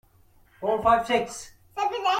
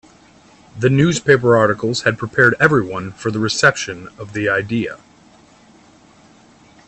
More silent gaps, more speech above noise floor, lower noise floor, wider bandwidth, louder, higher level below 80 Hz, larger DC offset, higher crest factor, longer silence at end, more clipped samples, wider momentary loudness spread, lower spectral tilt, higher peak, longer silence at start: neither; about the same, 34 dB vs 32 dB; first, -58 dBFS vs -48 dBFS; first, 16 kHz vs 8.8 kHz; second, -25 LUFS vs -16 LUFS; about the same, -54 dBFS vs -52 dBFS; neither; about the same, 18 dB vs 18 dB; second, 0 s vs 1.9 s; neither; first, 16 LU vs 13 LU; second, -3.5 dB/octave vs -5 dB/octave; second, -8 dBFS vs 0 dBFS; second, 0.6 s vs 0.75 s